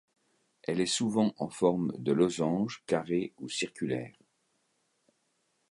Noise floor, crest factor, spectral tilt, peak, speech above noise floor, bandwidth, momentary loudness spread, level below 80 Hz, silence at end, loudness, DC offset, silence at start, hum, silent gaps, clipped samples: -76 dBFS; 20 dB; -5 dB/octave; -12 dBFS; 46 dB; 11.5 kHz; 8 LU; -70 dBFS; 1.6 s; -31 LUFS; under 0.1%; 0.7 s; none; none; under 0.1%